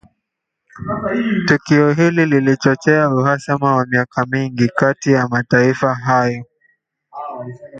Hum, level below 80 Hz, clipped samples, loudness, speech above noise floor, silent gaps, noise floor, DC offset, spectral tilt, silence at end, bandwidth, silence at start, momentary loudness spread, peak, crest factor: none; -52 dBFS; under 0.1%; -15 LUFS; 62 dB; none; -77 dBFS; under 0.1%; -7 dB/octave; 0 s; 8.6 kHz; 0.75 s; 14 LU; 0 dBFS; 16 dB